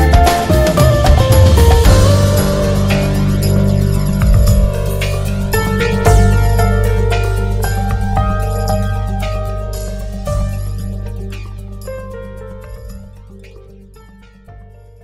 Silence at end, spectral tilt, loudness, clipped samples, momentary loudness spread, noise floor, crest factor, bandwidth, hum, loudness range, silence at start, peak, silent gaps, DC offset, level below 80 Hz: 0.4 s; -6 dB/octave; -14 LUFS; under 0.1%; 18 LU; -40 dBFS; 12 dB; 16 kHz; none; 18 LU; 0 s; 0 dBFS; none; under 0.1%; -16 dBFS